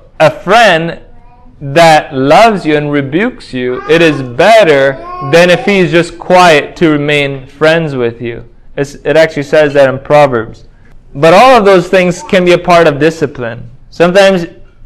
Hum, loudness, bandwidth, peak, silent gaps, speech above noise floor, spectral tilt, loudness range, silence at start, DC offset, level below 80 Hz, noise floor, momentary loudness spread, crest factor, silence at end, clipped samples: none; -8 LUFS; 16 kHz; 0 dBFS; none; 27 dB; -5.5 dB/octave; 3 LU; 0.2 s; under 0.1%; -38 dBFS; -34 dBFS; 14 LU; 8 dB; 0 s; 4%